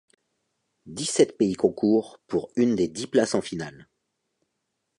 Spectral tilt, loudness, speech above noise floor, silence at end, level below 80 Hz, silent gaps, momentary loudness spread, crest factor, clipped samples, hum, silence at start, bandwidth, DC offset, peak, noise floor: -5 dB/octave; -25 LUFS; 55 dB; 1.15 s; -62 dBFS; none; 12 LU; 20 dB; under 0.1%; none; 0.85 s; 11.5 kHz; under 0.1%; -6 dBFS; -79 dBFS